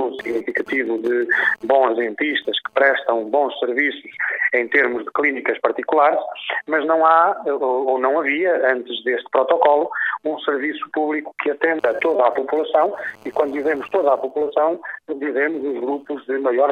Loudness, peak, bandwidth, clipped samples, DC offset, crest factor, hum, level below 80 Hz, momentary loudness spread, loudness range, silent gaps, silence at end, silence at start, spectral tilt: -19 LUFS; -2 dBFS; 8.2 kHz; under 0.1%; under 0.1%; 18 dB; none; -68 dBFS; 7 LU; 3 LU; none; 0 s; 0 s; -5 dB/octave